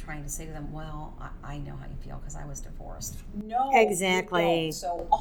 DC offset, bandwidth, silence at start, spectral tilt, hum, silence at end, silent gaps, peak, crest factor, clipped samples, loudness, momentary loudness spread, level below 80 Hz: under 0.1%; 19 kHz; 0 s; -4 dB/octave; none; 0 s; none; -8 dBFS; 22 dB; under 0.1%; -27 LUFS; 19 LU; -40 dBFS